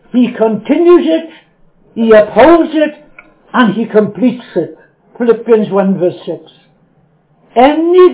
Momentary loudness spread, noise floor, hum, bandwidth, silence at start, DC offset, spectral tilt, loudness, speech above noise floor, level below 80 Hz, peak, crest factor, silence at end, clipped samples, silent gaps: 12 LU; -51 dBFS; none; 4 kHz; 0.15 s; under 0.1%; -10.5 dB/octave; -10 LUFS; 42 dB; -48 dBFS; 0 dBFS; 10 dB; 0 s; 1%; none